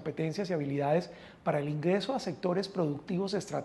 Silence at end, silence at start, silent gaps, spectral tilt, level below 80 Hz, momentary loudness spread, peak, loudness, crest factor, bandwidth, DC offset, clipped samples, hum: 0 s; 0 s; none; -6.5 dB/octave; -68 dBFS; 4 LU; -16 dBFS; -32 LUFS; 16 dB; 12 kHz; under 0.1%; under 0.1%; none